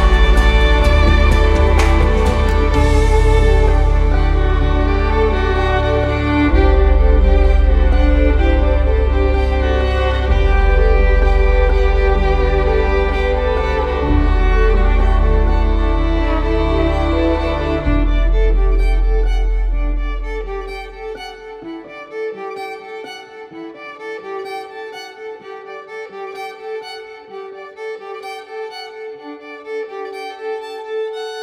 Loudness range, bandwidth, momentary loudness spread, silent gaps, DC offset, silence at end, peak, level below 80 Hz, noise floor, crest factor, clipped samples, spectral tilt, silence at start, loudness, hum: 15 LU; 8 kHz; 17 LU; none; under 0.1%; 0 s; 0 dBFS; -16 dBFS; -33 dBFS; 14 dB; under 0.1%; -7 dB/octave; 0 s; -16 LUFS; none